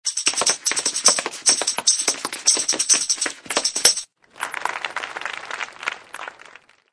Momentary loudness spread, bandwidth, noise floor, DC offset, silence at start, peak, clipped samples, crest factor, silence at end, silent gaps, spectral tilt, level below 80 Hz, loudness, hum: 13 LU; 11 kHz; -48 dBFS; under 0.1%; 0.05 s; 0 dBFS; under 0.1%; 22 dB; 0.45 s; none; 2 dB/octave; -68 dBFS; -19 LUFS; none